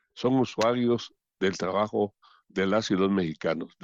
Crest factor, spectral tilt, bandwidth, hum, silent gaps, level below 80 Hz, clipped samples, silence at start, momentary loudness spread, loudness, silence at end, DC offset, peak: 14 dB; -6 dB/octave; 7.8 kHz; none; none; -66 dBFS; under 0.1%; 0.15 s; 6 LU; -27 LUFS; 0.15 s; under 0.1%; -14 dBFS